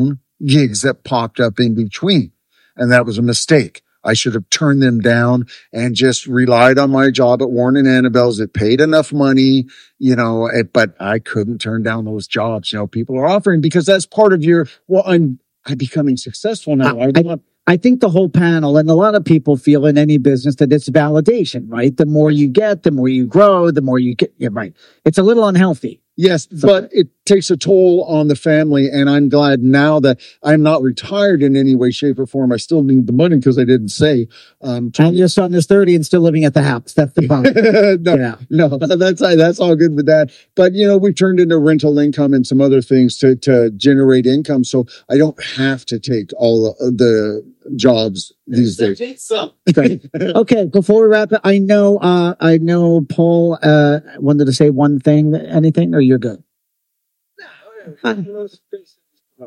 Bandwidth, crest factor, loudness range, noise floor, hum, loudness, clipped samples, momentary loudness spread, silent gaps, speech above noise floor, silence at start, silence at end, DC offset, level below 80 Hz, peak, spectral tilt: 11.5 kHz; 12 dB; 4 LU; -72 dBFS; none; -13 LUFS; 0.2%; 9 LU; none; 60 dB; 0 s; 0 s; under 0.1%; -54 dBFS; 0 dBFS; -6.5 dB/octave